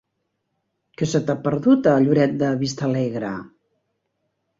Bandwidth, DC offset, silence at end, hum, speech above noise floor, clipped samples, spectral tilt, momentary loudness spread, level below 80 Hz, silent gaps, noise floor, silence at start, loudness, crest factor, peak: 7.8 kHz; under 0.1%; 1.15 s; none; 56 dB; under 0.1%; -7 dB/octave; 12 LU; -60 dBFS; none; -75 dBFS; 1 s; -20 LUFS; 18 dB; -4 dBFS